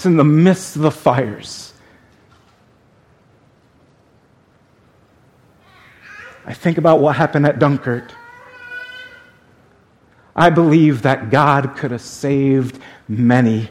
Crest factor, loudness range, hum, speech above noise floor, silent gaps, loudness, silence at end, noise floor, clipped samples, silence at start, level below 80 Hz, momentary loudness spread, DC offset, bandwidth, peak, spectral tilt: 18 dB; 8 LU; none; 39 dB; none; -15 LUFS; 0.05 s; -53 dBFS; under 0.1%; 0 s; -54 dBFS; 21 LU; under 0.1%; 13.5 kHz; 0 dBFS; -7 dB/octave